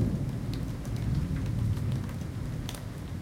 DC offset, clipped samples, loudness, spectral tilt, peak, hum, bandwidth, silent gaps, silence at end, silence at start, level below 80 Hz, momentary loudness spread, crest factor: under 0.1%; under 0.1%; -33 LUFS; -7 dB/octave; -16 dBFS; none; 17 kHz; none; 0 s; 0 s; -40 dBFS; 6 LU; 16 dB